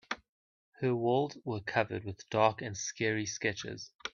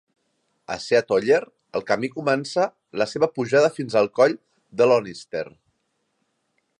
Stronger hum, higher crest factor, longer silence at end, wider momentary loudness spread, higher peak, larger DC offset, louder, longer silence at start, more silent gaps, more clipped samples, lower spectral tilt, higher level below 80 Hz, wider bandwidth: neither; about the same, 22 dB vs 18 dB; second, 0.05 s vs 1.3 s; about the same, 12 LU vs 13 LU; second, -12 dBFS vs -4 dBFS; neither; second, -34 LUFS vs -22 LUFS; second, 0.1 s vs 0.7 s; first, 0.29-0.72 s, 3.95-3.99 s vs none; neither; about the same, -4.5 dB/octave vs -5 dB/octave; about the same, -70 dBFS vs -68 dBFS; second, 7.4 kHz vs 10.5 kHz